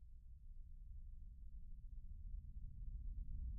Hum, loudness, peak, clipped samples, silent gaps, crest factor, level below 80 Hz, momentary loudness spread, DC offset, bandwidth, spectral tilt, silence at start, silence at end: none; -58 LUFS; -38 dBFS; under 0.1%; none; 12 dB; -52 dBFS; 9 LU; under 0.1%; 0.4 kHz; -24 dB/octave; 0 s; 0 s